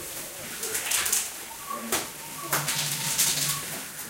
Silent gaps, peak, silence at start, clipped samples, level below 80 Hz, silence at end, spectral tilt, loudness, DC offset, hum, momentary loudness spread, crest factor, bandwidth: none; -4 dBFS; 0 s; under 0.1%; -62 dBFS; 0 s; -0.5 dB/octave; -27 LUFS; under 0.1%; none; 12 LU; 24 dB; 17 kHz